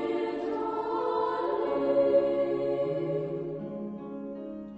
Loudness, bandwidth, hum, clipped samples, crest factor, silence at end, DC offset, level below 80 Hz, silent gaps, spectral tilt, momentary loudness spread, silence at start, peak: -30 LUFS; 7.4 kHz; none; under 0.1%; 16 dB; 0 s; under 0.1%; -64 dBFS; none; -8.5 dB/octave; 14 LU; 0 s; -14 dBFS